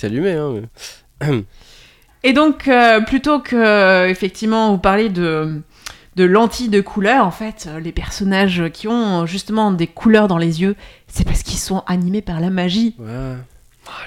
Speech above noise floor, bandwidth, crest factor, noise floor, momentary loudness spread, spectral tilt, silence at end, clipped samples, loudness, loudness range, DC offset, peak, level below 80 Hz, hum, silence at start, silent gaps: 21 dB; 16 kHz; 16 dB; -37 dBFS; 16 LU; -5.5 dB/octave; 0 s; under 0.1%; -16 LUFS; 4 LU; under 0.1%; 0 dBFS; -34 dBFS; none; 0 s; none